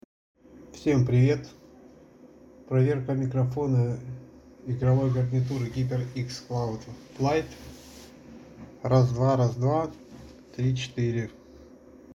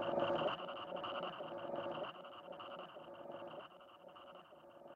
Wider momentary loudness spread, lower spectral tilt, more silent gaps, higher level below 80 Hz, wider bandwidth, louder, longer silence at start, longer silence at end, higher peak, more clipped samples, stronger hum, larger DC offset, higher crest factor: first, 24 LU vs 20 LU; first, -8 dB/octave vs -6.5 dB/octave; neither; first, -54 dBFS vs -80 dBFS; about the same, 7.4 kHz vs 7.4 kHz; first, -27 LUFS vs -45 LUFS; first, 0.55 s vs 0 s; about the same, 0.05 s vs 0 s; first, -10 dBFS vs -24 dBFS; neither; neither; neither; about the same, 18 dB vs 20 dB